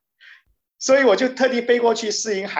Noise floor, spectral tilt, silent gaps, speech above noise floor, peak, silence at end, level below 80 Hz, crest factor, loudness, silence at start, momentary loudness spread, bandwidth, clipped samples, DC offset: -53 dBFS; -2.5 dB/octave; none; 35 dB; -6 dBFS; 0 s; -70 dBFS; 14 dB; -18 LUFS; 0.8 s; 7 LU; 8.4 kHz; under 0.1%; under 0.1%